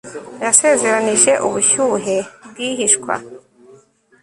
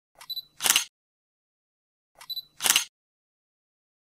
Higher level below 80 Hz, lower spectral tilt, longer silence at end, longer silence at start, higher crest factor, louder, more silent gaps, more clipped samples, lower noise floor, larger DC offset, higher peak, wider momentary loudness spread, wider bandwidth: first, -60 dBFS vs -74 dBFS; first, -1.5 dB/octave vs 2.5 dB/octave; second, 0.85 s vs 1.2 s; second, 0.05 s vs 0.2 s; second, 18 dB vs 32 dB; first, -15 LUFS vs -25 LUFS; second, none vs 0.89-2.15 s; neither; second, -49 dBFS vs under -90 dBFS; neither; about the same, 0 dBFS vs 0 dBFS; about the same, 13 LU vs 15 LU; second, 14 kHz vs 16 kHz